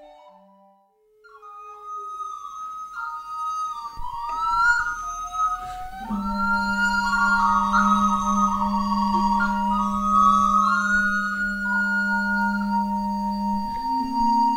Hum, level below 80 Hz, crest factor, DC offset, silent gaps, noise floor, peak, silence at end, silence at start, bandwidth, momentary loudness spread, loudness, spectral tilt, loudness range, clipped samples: none; -42 dBFS; 16 dB; under 0.1%; none; -60 dBFS; -8 dBFS; 0 s; 0 s; 16.5 kHz; 15 LU; -22 LUFS; -4.5 dB/octave; 12 LU; under 0.1%